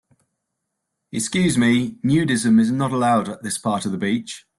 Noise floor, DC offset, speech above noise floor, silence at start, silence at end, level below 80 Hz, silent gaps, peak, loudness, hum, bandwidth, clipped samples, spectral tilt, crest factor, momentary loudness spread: -78 dBFS; under 0.1%; 59 dB; 1.15 s; 0.2 s; -56 dBFS; none; -8 dBFS; -20 LUFS; none; 12.5 kHz; under 0.1%; -5 dB/octave; 14 dB; 9 LU